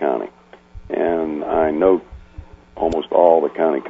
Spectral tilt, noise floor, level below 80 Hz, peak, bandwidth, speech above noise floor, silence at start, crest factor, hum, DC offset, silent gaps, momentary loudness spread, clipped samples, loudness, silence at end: -7.5 dB/octave; -40 dBFS; -44 dBFS; 0 dBFS; 7.8 kHz; 23 dB; 0 s; 18 dB; none; under 0.1%; none; 10 LU; under 0.1%; -18 LUFS; 0 s